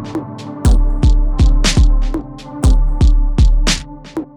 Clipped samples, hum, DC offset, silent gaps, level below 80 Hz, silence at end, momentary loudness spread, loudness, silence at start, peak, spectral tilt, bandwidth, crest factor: under 0.1%; none; under 0.1%; none; -12 dBFS; 0.1 s; 12 LU; -15 LUFS; 0 s; 0 dBFS; -5 dB/octave; 11.5 kHz; 12 dB